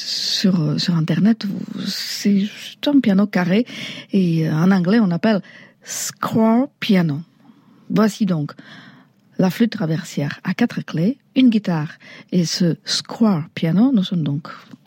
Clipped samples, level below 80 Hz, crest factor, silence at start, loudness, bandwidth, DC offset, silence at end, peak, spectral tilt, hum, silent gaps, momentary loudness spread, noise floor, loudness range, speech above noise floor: under 0.1%; -70 dBFS; 14 dB; 0 s; -19 LUFS; 16.5 kHz; under 0.1%; 0.25 s; -4 dBFS; -5.5 dB/octave; none; none; 9 LU; -50 dBFS; 4 LU; 31 dB